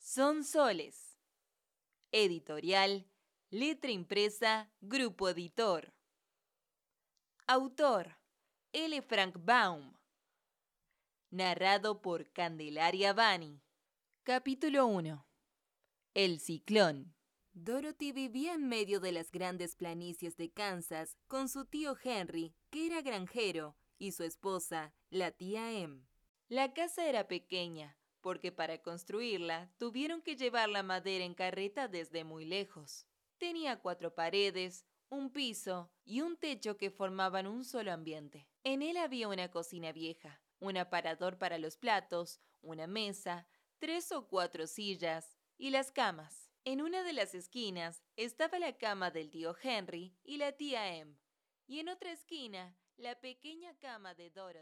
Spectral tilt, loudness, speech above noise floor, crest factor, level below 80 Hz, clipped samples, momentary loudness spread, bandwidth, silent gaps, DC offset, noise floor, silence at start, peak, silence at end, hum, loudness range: -3.5 dB/octave; -37 LUFS; over 52 dB; 24 dB; -82 dBFS; under 0.1%; 16 LU; 18 kHz; 26.29-26.35 s; under 0.1%; under -90 dBFS; 0 s; -14 dBFS; 0 s; none; 7 LU